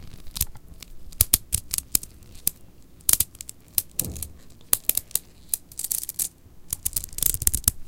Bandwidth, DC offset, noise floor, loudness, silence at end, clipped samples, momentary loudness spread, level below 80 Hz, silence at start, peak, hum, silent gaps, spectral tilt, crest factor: 17.5 kHz; under 0.1%; -47 dBFS; -24 LUFS; 0 s; under 0.1%; 16 LU; -40 dBFS; 0 s; 0 dBFS; none; none; -1 dB/octave; 28 dB